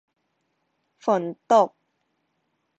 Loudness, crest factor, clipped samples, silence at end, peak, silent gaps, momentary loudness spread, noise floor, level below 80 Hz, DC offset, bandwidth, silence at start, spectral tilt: -23 LUFS; 20 dB; under 0.1%; 1.1 s; -6 dBFS; none; 8 LU; -74 dBFS; -76 dBFS; under 0.1%; 8.2 kHz; 1.05 s; -5.5 dB/octave